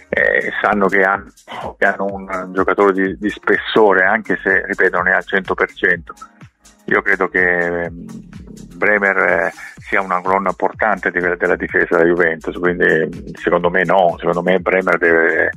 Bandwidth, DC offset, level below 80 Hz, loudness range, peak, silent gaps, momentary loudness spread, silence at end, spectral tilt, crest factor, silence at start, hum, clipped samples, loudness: 12 kHz; under 0.1%; -44 dBFS; 3 LU; 0 dBFS; none; 10 LU; 0 s; -6 dB/octave; 16 dB; 0.1 s; none; under 0.1%; -15 LUFS